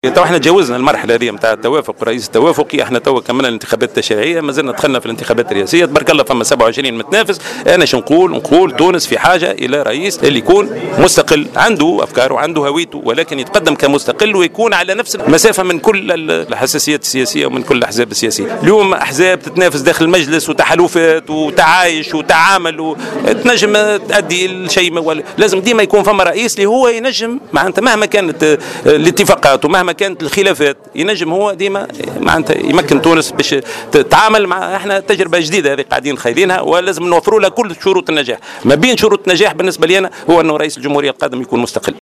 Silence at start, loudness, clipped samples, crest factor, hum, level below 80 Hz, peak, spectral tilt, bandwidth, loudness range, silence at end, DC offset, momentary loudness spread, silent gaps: 0.05 s; -11 LUFS; 0.2%; 12 dB; none; -44 dBFS; 0 dBFS; -3.5 dB/octave; 14.5 kHz; 2 LU; 0.1 s; under 0.1%; 6 LU; none